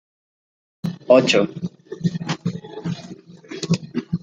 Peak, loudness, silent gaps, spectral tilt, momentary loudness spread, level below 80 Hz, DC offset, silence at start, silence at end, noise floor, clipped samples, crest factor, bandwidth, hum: -2 dBFS; -21 LUFS; none; -5.5 dB/octave; 18 LU; -58 dBFS; under 0.1%; 0.85 s; 0.05 s; -40 dBFS; under 0.1%; 20 dB; 9.2 kHz; none